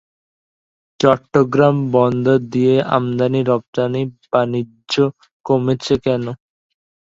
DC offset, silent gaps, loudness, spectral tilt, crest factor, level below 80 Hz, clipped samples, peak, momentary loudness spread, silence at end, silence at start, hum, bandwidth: under 0.1%; 3.68-3.73 s, 5.31-5.44 s; -17 LUFS; -7 dB/octave; 18 dB; -52 dBFS; under 0.1%; 0 dBFS; 8 LU; 0.7 s; 1 s; none; 7.8 kHz